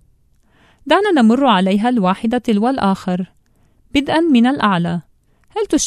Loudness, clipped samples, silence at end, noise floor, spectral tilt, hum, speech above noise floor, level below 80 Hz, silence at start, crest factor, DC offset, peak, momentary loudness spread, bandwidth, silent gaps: -15 LUFS; under 0.1%; 0 s; -55 dBFS; -5 dB/octave; none; 40 dB; -48 dBFS; 0.85 s; 16 dB; under 0.1%; 0 dBFS; 12 LU; 12.5 kHz; none